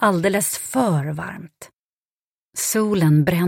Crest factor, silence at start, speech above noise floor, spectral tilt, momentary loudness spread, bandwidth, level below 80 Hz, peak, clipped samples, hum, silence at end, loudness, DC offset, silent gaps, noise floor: 16 dB; 0 s; over 71 dB; -5.5 dB/octave; 16 LU; 16.5 kHz; -54 dBFS; -6 dBFS; under 0.1%; none; 0 s; -20 LUFS; under 0.1%; 1.79-2.52 s; under -90 dBFS